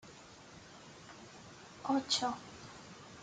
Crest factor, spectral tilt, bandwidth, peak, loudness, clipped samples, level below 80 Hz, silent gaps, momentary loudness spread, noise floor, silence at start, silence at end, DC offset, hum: 22 dB; -2.5 dB/octave; 9.6 kHz; -20 dBFS; -36 LUFS; under 0.1%; -72 dBFS; none; 21 LU; -55 dBFS; 0.05 s; 0 s; under 0.1%; none